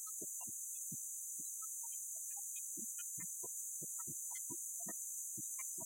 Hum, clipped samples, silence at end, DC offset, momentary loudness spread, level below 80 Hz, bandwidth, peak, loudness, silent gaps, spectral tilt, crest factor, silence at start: none; under 0.1%; 0 s; under 0.1%; 1 LU; under -90 dBFS; 16.5 kHz; -32 dBFS; -43 LUFS; none; -1.5 dB/octave; 14 dB; 0 s